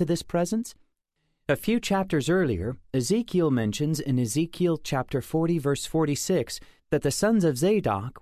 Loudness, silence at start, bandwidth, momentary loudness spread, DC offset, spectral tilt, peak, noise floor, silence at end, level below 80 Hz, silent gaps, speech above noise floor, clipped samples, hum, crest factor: -26 LUFS; 0 s; 14.5 kHz; 7 LU; under 0.1%; -5.5 dB/octave; -8 dBFS; -75 dBFS; 0 s; -50 dBFS; none; 50 dB; under 0.1%; none; 16 dB